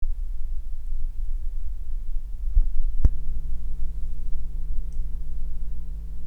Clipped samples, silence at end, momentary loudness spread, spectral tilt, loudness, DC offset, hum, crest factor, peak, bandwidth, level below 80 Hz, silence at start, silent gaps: under 0.1%; 0 s; 10 LU; -8.5 dB/octave; -34 LUFS; under 0.1%; none; 18 dB; -2 dBFS; 0.7 kHz; -24 dBFS; 0 s; none